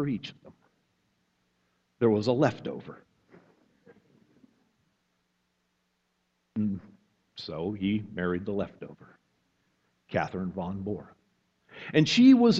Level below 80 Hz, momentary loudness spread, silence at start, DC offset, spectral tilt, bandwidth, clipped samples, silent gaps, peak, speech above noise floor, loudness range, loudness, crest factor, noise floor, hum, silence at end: -66 dBFS; 19 LU; 0 s; under 0.1%; -6.5 dB/octave; 7.8 kHz; under 0.1%; none; -8 dBFS; 50 dB; 9 LU; -28 LUFS; 22 dB; -76 dBFS; none; 0 s